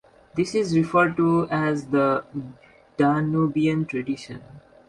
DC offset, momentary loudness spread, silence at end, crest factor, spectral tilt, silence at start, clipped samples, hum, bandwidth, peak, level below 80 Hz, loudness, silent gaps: under 0.1%; 16 LU; 0.3 s; 16 dB; -7 dB/octave; 0.35 s; under 0.1%; none; 11.5 kHz; -6 dBFS; -58 dBFS; -23 LUFS; none